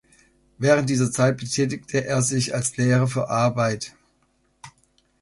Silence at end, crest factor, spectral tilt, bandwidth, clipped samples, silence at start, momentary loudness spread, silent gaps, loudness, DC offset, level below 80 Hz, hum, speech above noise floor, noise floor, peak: 0.55 s; 18 dB; -5 dB/octave; 11.5 kHz; under 0.1%; 0.6 s; 5 LU; none; -22 LUFS; under 0.1%; -56 dBFS; none; 44 dB; -66 dBFS; -4 dBFS